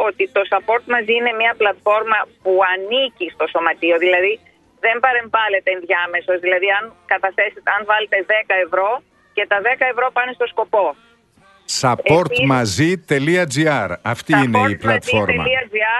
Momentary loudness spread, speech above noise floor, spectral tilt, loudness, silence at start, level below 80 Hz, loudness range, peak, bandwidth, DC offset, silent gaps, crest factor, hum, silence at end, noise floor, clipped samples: 6 LU; 35 dB; -4.5 dB/octave; -17 LUFS; 0 s; -52 dBFS; 2 LU; 0 dBFS; 12 kHz; under 0.1%; none; 16 dB; none; 0 s; -52 dBFS; under 0.1%